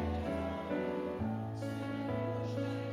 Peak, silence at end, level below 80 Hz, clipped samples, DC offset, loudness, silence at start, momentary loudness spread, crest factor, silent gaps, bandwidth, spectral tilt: -24 dBFS; 0 s; -56 dBFS; under 0.1%; under 0.1%; -38 LUFS; 0 s; 3 LU; 12 dB; none; 13.5 kHz; -8 dB/octave